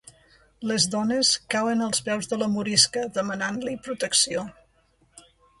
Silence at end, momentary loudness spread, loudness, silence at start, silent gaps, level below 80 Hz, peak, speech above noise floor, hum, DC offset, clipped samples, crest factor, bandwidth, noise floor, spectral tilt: 0.4 s; 12 LU; -23 LUFS; 0.6 s; none; -62 dBFS; -4 dBFS; 39 dB; none; under 0.1%; under 0.1%; 22 dB; 12 kHz; -64 dBFS; -2.5 dB/octave